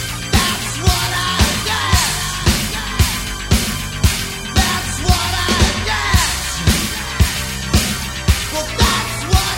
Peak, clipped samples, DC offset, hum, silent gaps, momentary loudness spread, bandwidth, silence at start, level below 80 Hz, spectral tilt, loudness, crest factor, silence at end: 0 dBFS; under 0.1%; 0.1%; none; none; 4 LU; 16.5 kHz; 0 s; -22 dBFS; -3 dB/octave; -17 LUFS; 16 dB; 0 s